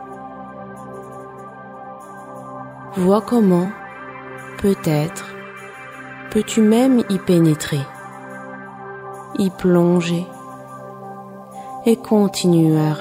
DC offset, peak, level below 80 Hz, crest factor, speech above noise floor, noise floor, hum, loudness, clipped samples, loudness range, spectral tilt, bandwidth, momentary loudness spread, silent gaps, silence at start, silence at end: under 0.1%; -4 dBFS; -54 dBFS; 16 dB; 20 dB; -36 dBFS; none; -17 LUFS; under 0.1%; 3 LU; -6.5 dB/octave; 16 kHz; 20 LU; none; 0 s; 0 s